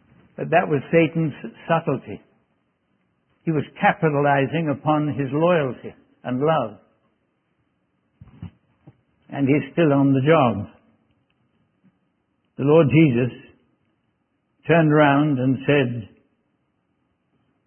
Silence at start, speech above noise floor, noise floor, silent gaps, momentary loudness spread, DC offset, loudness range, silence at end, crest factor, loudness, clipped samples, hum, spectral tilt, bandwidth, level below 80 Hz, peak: 0.4 s; 51 dB; -70 dBFS; none; 20 LU; under 0.1%; 6 LU; 1.6 s; 20 dB; -20 LUFS; under 0.1%; none; -12 dB/octave; 3.3 kHz; -60 dBFS; -2 dBFS